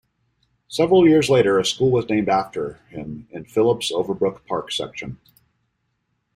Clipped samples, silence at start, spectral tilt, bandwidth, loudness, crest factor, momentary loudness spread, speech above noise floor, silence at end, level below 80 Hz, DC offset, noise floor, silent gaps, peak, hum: under 0.1%; 0.7 s; -5.5 dB/octave; 12.5 kHz; -19 LUFS; 18 dB; 19 LU; 52 dB; 1.2 s; -54 dBFS; under 0.1%; -72 dBFS; none; -4 dBFS; none